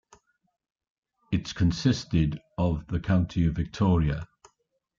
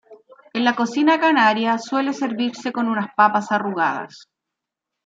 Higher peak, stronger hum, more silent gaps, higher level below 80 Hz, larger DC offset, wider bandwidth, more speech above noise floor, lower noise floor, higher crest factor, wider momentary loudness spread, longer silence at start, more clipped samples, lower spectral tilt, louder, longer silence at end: second, -10 dBFS vs -2 dBFS; neither; neither; first, -42 dBFS vs -76 dBFS; neither; about the same, 7.6 kHz vs 7.8 kHz; second, 49 dB vs 64 dB; second, -74 dBFS vs -84 dBFS; about the same, 16 dB vs 18 dB; about the same, 7 LU vs 9 LU; first, 1.3 s vs 0.1 s; neither; first, -7 dB/octave vs -4.5 dB/octave; second, -27 LUFS vs -19 LUFS; second, 0.75 s vs 0.9 s